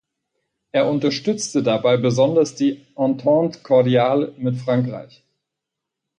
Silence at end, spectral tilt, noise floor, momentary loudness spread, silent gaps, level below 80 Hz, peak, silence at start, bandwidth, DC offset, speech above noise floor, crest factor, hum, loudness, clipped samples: 1.15 s; -6 dB/octave; -83 dBFS; 7 LU; none; -64 dBFS; -4 dBFS; 0.75 s; 10 kHz; under 0.1%; 64 dB; 16 dB; none; -19 LUFS; under 0.1%